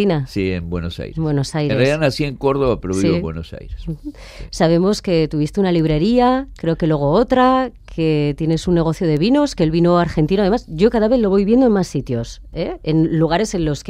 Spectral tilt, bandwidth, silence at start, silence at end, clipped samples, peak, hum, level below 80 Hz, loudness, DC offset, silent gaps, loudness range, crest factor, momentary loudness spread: -7 dB/octave; 12 kHz; 0 s; 0 s; under 0.1%; -2 dBFS; none; -36 dBFS; -17 LUFS; under 0.1%; none; 4 LU; 16 dB; 12 LU